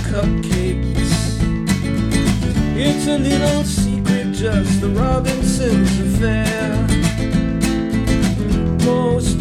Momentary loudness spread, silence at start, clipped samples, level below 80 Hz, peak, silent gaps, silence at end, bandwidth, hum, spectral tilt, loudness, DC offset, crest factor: 3 LU; 0 s; under 0.1%; -24 dBFS; -4 dBFS; none; 0 s; 14.5 kHz; none; -6 dB/octave; -17 LUFS; under 0.1%; 14 dB